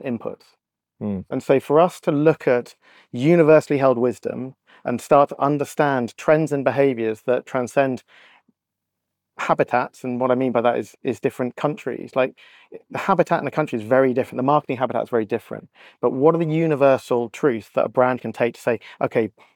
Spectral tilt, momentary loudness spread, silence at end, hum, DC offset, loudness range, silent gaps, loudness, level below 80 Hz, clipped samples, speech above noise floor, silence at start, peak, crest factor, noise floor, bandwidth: -7 dB/octave; 11 LU; 0.25 s; none; under 0.1%; 5 LU; none; -21 LUFS; -68 dBFS; under 0.1%; 61 dB; 0 s; -4 dBFS; 18 dB; -82 dBFS; 18 kHz